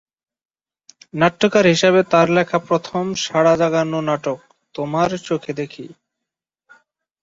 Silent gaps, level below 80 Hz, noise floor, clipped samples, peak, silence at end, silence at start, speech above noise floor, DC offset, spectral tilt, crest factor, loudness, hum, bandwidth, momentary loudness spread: none; -58 dBFS; -84 dBFS; under 0.1%; -2 dBFS; 1.3 s; 1.15 s; 67 dB; under 0.1%; -5 dB/octave; 18 dB; -18 LUFS; none; 7.8 kHz; 15 LU